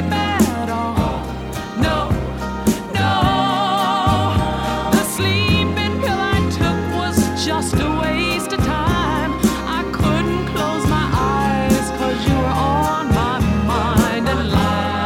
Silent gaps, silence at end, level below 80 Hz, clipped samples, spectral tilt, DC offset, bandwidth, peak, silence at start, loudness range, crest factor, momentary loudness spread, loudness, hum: none; 0 s; -30 dBFS; under 0.1%; -5.5 dB/octave; under 0.1%; 17.5 kHz; 0 dBFS; 0 s; 2 LU; 18 dB; 4 LU; -18 LUFS; none